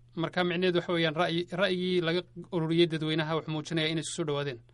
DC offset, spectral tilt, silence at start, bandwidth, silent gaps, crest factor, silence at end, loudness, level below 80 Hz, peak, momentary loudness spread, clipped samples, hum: under 0.1%; -5.5 dB/octave; 0.15 s; 11 kHz; none; 16 dB; 0.1 s; -29 LUFS; -64 dBFS; -12 dBFS; 6 LU; under 0.1%; none